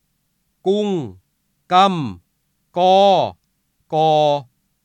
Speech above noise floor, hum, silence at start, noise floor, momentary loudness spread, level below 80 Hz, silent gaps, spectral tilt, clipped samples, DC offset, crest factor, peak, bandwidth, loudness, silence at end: 53 dB; none; 0.65 s; -68 dBFS; 13 LU; -66 dBFS; none; -6 dB/octave; under 0.1%; under 0.1%; 16 dB; -2 dBFS; 9.6 kHz; -17 LUFS; 0.4 s